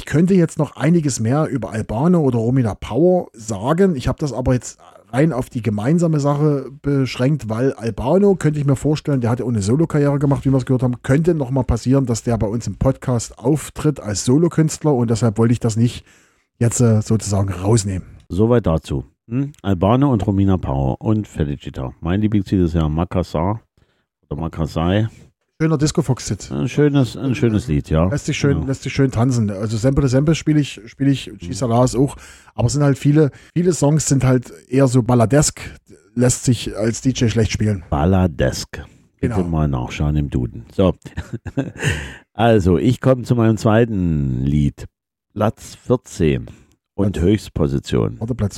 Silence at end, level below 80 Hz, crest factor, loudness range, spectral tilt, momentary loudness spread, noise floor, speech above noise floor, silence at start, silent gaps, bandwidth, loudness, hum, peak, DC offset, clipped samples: 0 s; -36 dBFS; 16 dB; 4 LU; -6.5 dB/octave; 9 LU; -62 dBFS; 44 dB; 0 s; none; 13.5 kHz; -18 LUFS; none; -2 dBFS; under 0.1%; under 0.1%